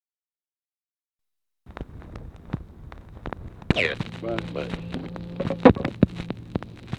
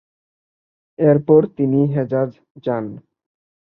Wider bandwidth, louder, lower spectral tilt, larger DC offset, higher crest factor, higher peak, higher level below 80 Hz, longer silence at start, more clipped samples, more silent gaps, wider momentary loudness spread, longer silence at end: first, 9.8 kHz vs 4.1 kHz; second, -25 LUFS vs -18 LUFS; second, -7.5 dB/octave vs -12.5 dB/octave; neither; first, 26 dB vs 18 dB; about the same, 0 dBFS vs -2 dBFS; first, -42 dBFS vs -62 dBFS; first, 1.65 s vs 1 s; neither; second, none vs 2.51-2.55 s; first, 24 LU vs 12 LU; second, 0 s vs 0.8 s